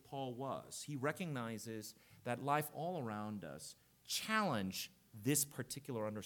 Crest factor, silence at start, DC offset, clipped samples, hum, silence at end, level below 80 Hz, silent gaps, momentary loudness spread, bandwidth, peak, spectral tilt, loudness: 22 dB; 0.05 s; under 0.1%; under 0.1%; none; 0 s; -80 dBFS; none; 13 LU; 19 kHz; -20 dBFS; -4 dB/octave; -42 LUFS